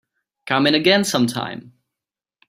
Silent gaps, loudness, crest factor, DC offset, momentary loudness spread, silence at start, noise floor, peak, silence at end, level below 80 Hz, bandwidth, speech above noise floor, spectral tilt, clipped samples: none; -18 LUFS; 20 dB; under 0.1%; 14 LU; 0.45 s; -88 dBFS; -2 dBFS; 0.8 s; -62 dBFS; 16 kHz; 69 dB; -4 dB/octave; under 0.1%